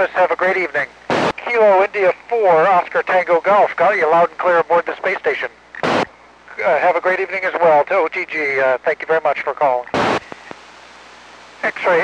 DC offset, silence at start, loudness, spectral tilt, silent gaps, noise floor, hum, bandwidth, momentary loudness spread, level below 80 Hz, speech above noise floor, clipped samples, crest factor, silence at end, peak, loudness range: under 0.1%; 0 s; -16 LUFS; -5 dB/octave; none; -42 dBFS; none; 9.8 kHz; 9 LU; -58 dBFS; 26 dB; under 0.1%; 12 dB; 0 s; -4 dBFS; 5 LU